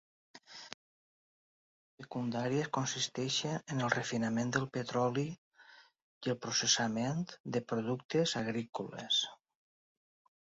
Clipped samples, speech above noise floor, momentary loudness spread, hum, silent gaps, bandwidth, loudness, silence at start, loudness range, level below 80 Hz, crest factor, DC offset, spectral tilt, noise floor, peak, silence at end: under 0.1%; 26 dB; 12 LU; none; 0.74-1.98 s, 5.38-5.51 s, 6.02-6.21 s, 7.40-7.44 s, 8.05-8.09 s, 8.69-8.73 s; 7.6 kHz; -35 LUFS; 0.35 s; 4 LU; -74 dBFS; 24 dB; under 0.1%; -3.5 dB/octave; -61 dBFS; -12 dBFS; 1.1 s